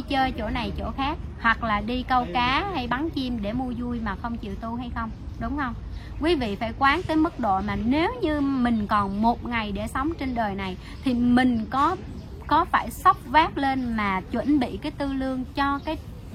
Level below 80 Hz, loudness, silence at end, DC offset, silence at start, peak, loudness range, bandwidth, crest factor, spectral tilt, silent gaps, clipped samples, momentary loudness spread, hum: -38 dBFS; -25 LUFS; 0 s; under 0.1%; 0 s; -6 dBFS; 6 LU; 15.5 kHz; 20 dB; -6 dB/octave; none; under 0.1%; 11 LU; none